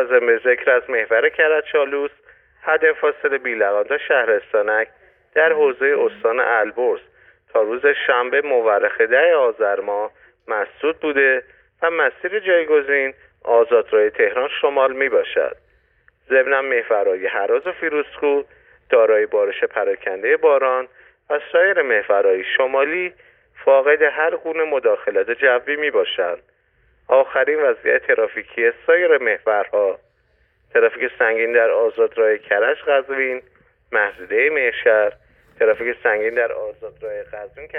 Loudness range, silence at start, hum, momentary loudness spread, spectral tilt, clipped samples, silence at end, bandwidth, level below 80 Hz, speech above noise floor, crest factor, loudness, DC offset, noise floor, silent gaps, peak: 2 LU; 0 s; none; 8 LU; -6.5 dB/octave; under 0.1%; 0 s; 3.8 kHz; -62 dBFS; 44 dB; 14 dB; -18 LUFS; under 0.1%; -61 dBFS; none; -4 dBFS